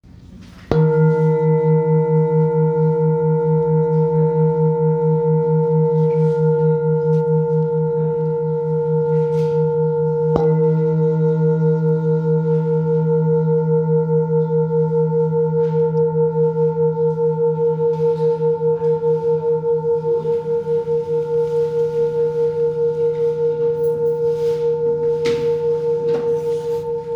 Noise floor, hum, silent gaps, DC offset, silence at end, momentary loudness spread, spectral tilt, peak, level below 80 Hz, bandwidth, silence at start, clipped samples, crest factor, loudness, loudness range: -40 dBFS; none; none; under 0.1%; 0 s; 3 LU; -10.5 dB/octave; 0 dBFS; -50 dBFS; 5.6 kHz; 0.2 s; under 0.1%; 16 dB; -18 LUFS; 3 LU